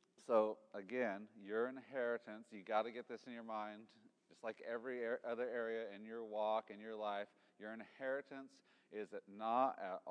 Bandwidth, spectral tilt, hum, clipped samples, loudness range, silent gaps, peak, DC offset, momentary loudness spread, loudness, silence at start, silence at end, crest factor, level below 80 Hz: 10 kHz; -5.5 dB/octave; none; under 0.1%; 3 LU; none; -24 dBFS; under 0.1%; 15 LU; -44 LUFS; 0.2 s; 0 s; 20 dB; under -90 dBFS